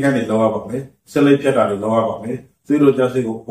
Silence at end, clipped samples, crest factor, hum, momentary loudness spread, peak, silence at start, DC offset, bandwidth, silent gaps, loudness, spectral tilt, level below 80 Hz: 0.1 s; under 0.1%; 16 dB; none; 14 LU; -2 dBFS; 0 s; under 0.1%; 13.5 kHz; none; -17 LUFS; -7 dB/octave; -56 dBFS